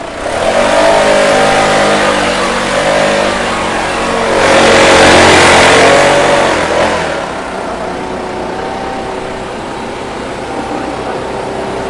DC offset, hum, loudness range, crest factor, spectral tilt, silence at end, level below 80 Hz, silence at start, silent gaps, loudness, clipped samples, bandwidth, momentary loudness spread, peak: under 0.1%; none; 13 LU; 10 dB; -3 dB/octave; 0 s; -34 dBFS; 0 s; none; -9 LUFS; 0.3%; 12 kHz; 15 LU; 0 dBFS